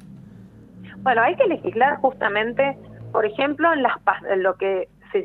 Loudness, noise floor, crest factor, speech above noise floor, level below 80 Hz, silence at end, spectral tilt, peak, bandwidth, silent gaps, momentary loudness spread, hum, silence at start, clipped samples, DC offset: -21 LUFS; -44 dBFS; 20 dB; 24 dB; -58 dBFS; 0 s; -7.5 dB/octave; -2 dBFS; 4.3 kHz; none; 8 LU; none; 0 s; under 0.1%; under 0.1%